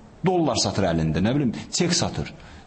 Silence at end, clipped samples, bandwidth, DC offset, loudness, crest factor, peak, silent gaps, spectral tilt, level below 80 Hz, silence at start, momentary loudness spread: 0.05 s; under 0.1%; 8.8 kHz; under 0.1%; -23 LUFS; 14 dB; -10 dBFS; none; -4.5 dB/octave; -44 dBFS; 0 s; 6 LU